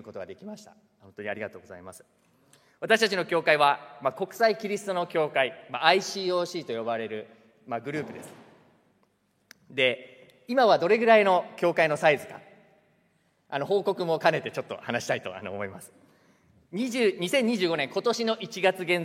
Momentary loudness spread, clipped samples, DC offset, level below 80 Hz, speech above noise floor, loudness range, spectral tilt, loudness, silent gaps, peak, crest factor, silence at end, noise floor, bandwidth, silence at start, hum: 18 LU; under 0.1%; under 0.1%; -80 dBFS; 43 dB; 9 LU; -4 dB/octave; -26 LUFS; none; -2 dBFS; 24 dB; 0 s; -69 dBFS; 16 kHz; 0.05 s; none